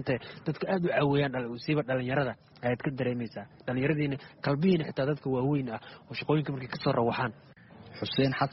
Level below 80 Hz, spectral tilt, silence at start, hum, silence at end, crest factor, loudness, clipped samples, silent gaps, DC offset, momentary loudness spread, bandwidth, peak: -60 dBFS; -5.5 dB/octave; 0 s; none; 0 s; 18 dB; -30 LUFS; under 0.1%; none; under 0.1%; 10 LU; 5.8 kHz; -12 dBFS